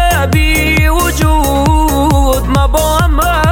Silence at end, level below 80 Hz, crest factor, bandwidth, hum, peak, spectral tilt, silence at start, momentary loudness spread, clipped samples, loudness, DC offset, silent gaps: 0 s; -14 dBFS; 10 dB; 17 kHz; none; 0 dBFS; -5 dB/octave; 0 s; 1 LU; under 0.1%; -11 LUFS; under 0.1%; none